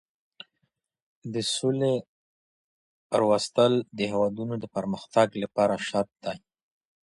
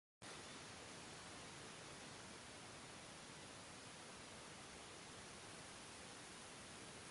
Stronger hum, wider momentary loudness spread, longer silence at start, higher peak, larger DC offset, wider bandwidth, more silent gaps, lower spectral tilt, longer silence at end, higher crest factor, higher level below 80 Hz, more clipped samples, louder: neither; first, 11 LU vs 1 LU; first, 1.25 s vs 0.2 s; first, -8 dBFS vs -44 dBFS; neither; about the same, 11.5 kHz vs 11.5 kHz; first, 2.08-3.10 s vs none; first, -5 dB/octave vs -2.5 dB/octave; first, 0.65 s vs 0 s; first, 20 dB vs 14 dB; first, -66 dBFS vs -76 dBFS; neither; first, -27 LUFS vs -55 LUFS